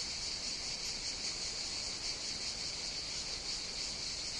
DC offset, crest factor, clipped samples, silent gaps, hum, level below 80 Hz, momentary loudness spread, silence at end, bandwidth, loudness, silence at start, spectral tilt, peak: under 0.1%; 14 dB; under 0.1%; none; none; -56 dBFS; 1 LU; 0 s; 12 kHz; -37 LUFS; 0 s; 0 dB/octave; -26 dBFS